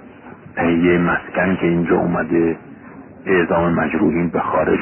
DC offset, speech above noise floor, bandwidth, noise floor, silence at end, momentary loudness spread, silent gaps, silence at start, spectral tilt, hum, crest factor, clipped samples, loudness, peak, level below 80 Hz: under 0.1%; 22 dB; 3.3 kHz; -39 dBFS; 0 s; 6 LU; none; 0 s; -12.5 dB/octave; none; 14 dB; under 0.1%; -17 LUFS; -4 dBFS; -42 dBFS